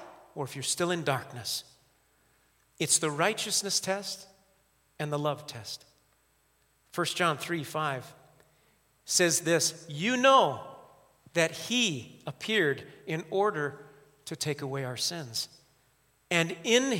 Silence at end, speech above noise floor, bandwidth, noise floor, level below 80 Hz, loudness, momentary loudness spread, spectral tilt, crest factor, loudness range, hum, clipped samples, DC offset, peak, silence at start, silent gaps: 0 s; 40 dB; 16.5 kHz; -69 dBFS; -76 dBFS; -29 LUFS; 15 LU; -3 dB/octave; 22 dB; 7 LU; none; under 0.1%; under 0.1%; -8 dBFS; 0 s; none